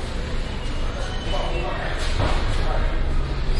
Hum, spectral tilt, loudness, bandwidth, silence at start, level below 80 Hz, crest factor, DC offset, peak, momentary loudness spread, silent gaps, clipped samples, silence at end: none; -5.5 dB/octave; -27 LUFS; 11 kHz; 0 s; -24 dBFS; 14 dB; under 0.1%; -8 dBFS; 6 LU; none; under 0.1%; 0 s